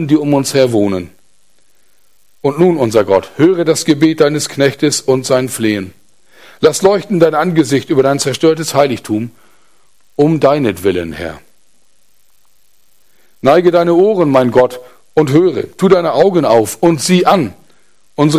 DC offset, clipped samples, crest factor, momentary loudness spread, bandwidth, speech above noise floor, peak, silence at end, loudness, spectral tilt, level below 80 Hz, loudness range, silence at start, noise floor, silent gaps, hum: 0.6%; under 0.1%; 12 dB; 9 LU; 15.5 kHz; 46 dB; 0 dBFS; 0 s; -12 LUFS; -5.5 dB/octave; -48 dBFS; 6 LU; 0 s; -58 dBFS; none; none